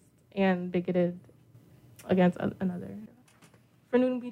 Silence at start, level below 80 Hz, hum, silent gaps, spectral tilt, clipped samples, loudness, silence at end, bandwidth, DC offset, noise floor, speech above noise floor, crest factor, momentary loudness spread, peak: 0.35 s; -66 dBFS; none; none; -8.5 dB/octave; under 0.1%; -29 LUFS; 0 s; 10 kHz; under 0.1%; -60 dBFS; 32 dB; 18 dB; 18 LU; -14 dBFS